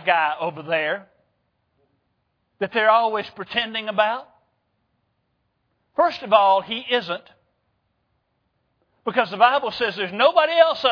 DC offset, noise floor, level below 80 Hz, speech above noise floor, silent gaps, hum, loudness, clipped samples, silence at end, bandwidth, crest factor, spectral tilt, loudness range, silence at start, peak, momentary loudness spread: under 0.1%; -72 dBFS; -68 dBFS; 51 dB; none; none; -20 LUFS; under 0.1%; 0 s; 5.4 kHz; 22 dB; -5 dB/octave; 2 LU; 0 s; -2 dBFS; 13 LU